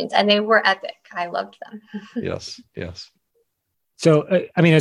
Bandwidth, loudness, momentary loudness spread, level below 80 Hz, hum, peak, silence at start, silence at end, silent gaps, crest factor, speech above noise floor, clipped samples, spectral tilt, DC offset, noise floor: 11.5 kHz; -20 LUFS; 19 LU; -54 dBFS; none; -2 dBFS; 0 s; 0 s; none; 20 dB; 54 dB; under 0.1%; -6 dB/octave; under 0.1%; -75 dBFS